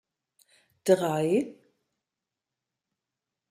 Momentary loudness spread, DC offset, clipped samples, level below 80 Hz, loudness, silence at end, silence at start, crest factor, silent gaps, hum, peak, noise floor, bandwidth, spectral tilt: 10 LU; under 0.1%; under 0.1%; -76 dBFS; -26 LUFS; 2 s; 0.85 s; 22 dB; none; none; -8 dBFS; -88 dBFS; 15 kHz; -6 dB/octave